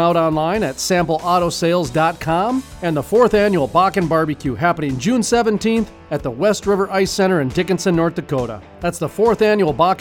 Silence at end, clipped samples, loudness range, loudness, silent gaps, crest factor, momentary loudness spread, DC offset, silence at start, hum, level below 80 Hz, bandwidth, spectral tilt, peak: 0 s; under 0.1%; 2 LU; -17 LUFS; none; 14 dB; 7 LU; under 0.1%; 0 s; none; -42 dBFS; 18 kHz; -5.5 dB/octave; -2 dBFS